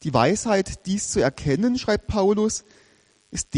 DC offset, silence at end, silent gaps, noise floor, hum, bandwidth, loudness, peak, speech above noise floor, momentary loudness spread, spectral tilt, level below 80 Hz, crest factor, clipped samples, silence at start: under 0.1%; 0 s; none; -59 dBFS; none; 11 kHz; -23 LUFS; -4 dBFS; 37 dB; 8 LU; -5 dB/octave; -44 dBFS; 18 dB; under 0.1%; 0 s